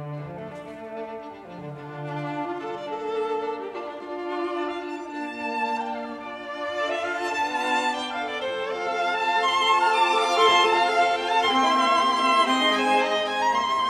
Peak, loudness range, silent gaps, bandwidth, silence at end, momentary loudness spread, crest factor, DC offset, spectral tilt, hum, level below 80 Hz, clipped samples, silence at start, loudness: -6 dBFS; 12 LU; none; 14 kHz; 0 s; 16 LU; 18 dB; under 0.1%; -3 dB/octave; none; -66 dBFS; under 0.1%; 0 s; -23 LUFS